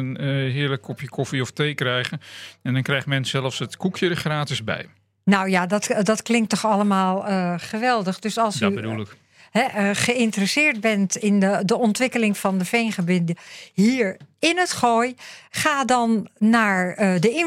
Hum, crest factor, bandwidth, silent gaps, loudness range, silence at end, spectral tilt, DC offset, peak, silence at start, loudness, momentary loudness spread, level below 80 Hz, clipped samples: none; 18 dB; 15.5 kHz; none; 4 LU; 0 s; -5 dB/octave; under 0.1%; -2 dBFS; 0 s; -21 LUFS; 9 LU; -66 dBFS; under 0.1%